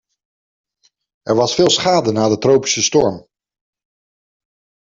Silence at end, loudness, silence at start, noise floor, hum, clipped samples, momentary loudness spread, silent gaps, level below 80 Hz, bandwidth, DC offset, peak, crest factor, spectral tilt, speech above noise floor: 1.7 s; -15 LUFS; 1.25 s; under -90 dBFS; none; under 0.1%; 7 LU; none; -54 dBFS; 7.8 kHz; under 0.1%; -2 dBFS; 16 dB; -3.5 dB/octave; over 76 dB